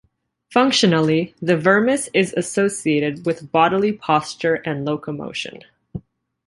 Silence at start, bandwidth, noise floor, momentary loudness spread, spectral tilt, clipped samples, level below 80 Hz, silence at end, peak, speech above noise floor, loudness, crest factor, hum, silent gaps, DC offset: 0.5 s; 11.5 kHz; -54 dBFS; 13 LU; -4.5 dB/octave; under 0.1%; -56 dBFS; 0.5 s; -2 dBFS; 35 dB; -19 LUFS; 18 dB; none; none; under 0.1%